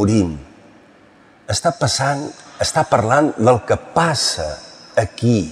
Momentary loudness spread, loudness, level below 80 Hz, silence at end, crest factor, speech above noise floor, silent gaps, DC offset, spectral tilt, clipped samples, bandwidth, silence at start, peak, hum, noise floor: 10 LU; -18 LUFS; -46 dBFS; 0 s; 16 dB; 31 dB; none; under 0.1%; -4.5 dB/octave; under 0.1%; 14 kHz; 0 s; -2 dBFS; none; -48 dBFS